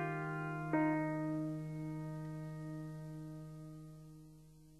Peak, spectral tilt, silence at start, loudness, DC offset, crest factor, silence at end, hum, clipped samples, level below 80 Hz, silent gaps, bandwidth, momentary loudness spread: -24 dBFS; -8.5 dB/octave; 0 s; -41 LUFS; under 0.1%; 18 dB; 0 s; none; under 0.1%; -68 dBFS; none; 13 kHz; 20 LU